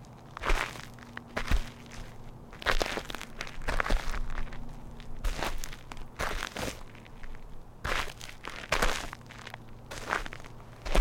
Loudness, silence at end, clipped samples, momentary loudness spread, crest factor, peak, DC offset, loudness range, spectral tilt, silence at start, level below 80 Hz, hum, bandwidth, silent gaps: -35 LUFS; 0 s; under 0.1%; 16 LU; 24 dB; -8 dBFS; under 0.1%; 4 LU; -3.5 dB/octave; 0 s; -36 dBFS; none; 16.5 kHz; none